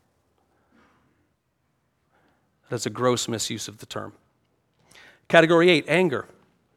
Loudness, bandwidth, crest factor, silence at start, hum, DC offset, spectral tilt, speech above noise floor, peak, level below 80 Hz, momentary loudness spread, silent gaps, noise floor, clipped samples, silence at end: -22 LUFS; 14.5 kHz; 26 dB; 2.7 s; none; under 0.1%; -4.5 dB/octave; 51 dB; 0 dBFS; -70 dBFS; 19 LU; none; -72 dBFS; under 0.1%; 0.5 s